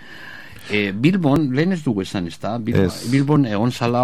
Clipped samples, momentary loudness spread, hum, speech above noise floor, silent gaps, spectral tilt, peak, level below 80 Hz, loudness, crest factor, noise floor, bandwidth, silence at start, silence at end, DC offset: under 0.1%; 13 LU; none; 20 dB; none; -7 dB/octave; -4 dBFS; -50 dBFS; -19 LUFS; 16 dB; -38 dBFS; 14.5 kHz; 0 s; 0 s; 0.9%